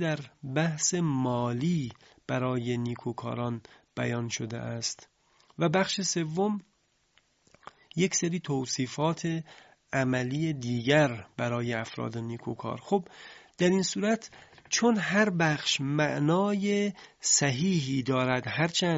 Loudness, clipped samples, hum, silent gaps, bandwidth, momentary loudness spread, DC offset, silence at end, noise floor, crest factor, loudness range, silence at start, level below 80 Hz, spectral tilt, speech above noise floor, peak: -29 LUFS; under 0.1%; none; none; 8 kHz; 11 LU; under 0.1%; 0 s; -69 dBFS; 20 dB; 6 LU; 0 s; -64 dBFS; -4.5 dB/octave; 40 dB; -10 dBFS